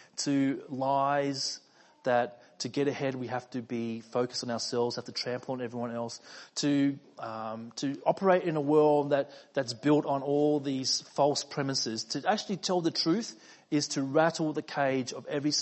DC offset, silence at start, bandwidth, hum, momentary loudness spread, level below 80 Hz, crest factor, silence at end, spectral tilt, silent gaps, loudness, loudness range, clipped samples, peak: under 0.1%; 0.15 s; 8.6 kHz; none; 10 LU; -78 dBFS; 20 dB; 0 s; -4.5 dB/octave; none; -30 LUFS; 5 LU; under 0.1%; -10 dBFS